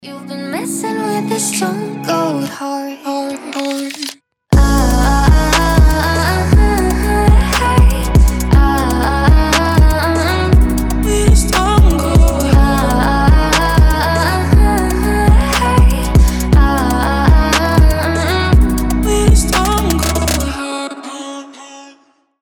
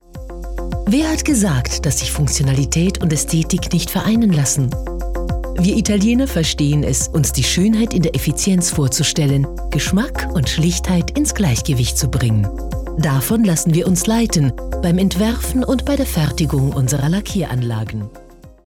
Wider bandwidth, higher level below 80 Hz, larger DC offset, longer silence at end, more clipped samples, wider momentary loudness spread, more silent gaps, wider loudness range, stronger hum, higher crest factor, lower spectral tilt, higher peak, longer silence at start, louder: about the same, 19 kHz vs 18 kHz; first, -14 dBFS vs -26 dBFS; neither; first, 0.6 s vs 0.15 s; neither; first, 10 LU vs 7 LU; neither; first, 6 LU vs 2 LU; neither; about the same, 12 dB vs 12 dB; about the same, -5.5 dB/octave vs -5 dB/octave; first, 0 dBFS vs -6 dBFS; about the same, 0.05 s vs 0.15 s; first, -13 LUFS vs -17 LUFS